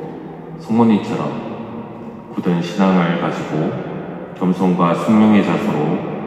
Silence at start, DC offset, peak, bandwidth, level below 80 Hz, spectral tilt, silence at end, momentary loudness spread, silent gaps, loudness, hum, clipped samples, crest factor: 0 s; under 0.1%; 0 dBFS; 9.6 kHz; -56 dBFS; -8 dB/octave; 0 s; 17 LU; none; -17 LUFS; none; under 0.1%; 16 dB